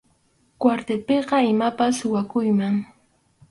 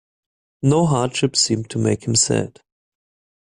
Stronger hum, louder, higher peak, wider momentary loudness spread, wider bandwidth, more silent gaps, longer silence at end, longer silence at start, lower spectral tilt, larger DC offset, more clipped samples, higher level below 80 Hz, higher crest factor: neither; second, -22 LUFS vs -19 LUFS; about the same, -4 dBFS vs -4 dBFS; about the same, 6 LU vs 6 LU; about the same, 11.5 kHz vs 11.5 kHz; neither; second, 0.65 s vs 0.95 s; about the same, 0.6 s vs 0.65 s; first, -6 dB/octave vs -4.5 dB/octave; neither; neither; second, -62 dBFS vs -52 dBFS; about the same, 18 dB vs 18 dB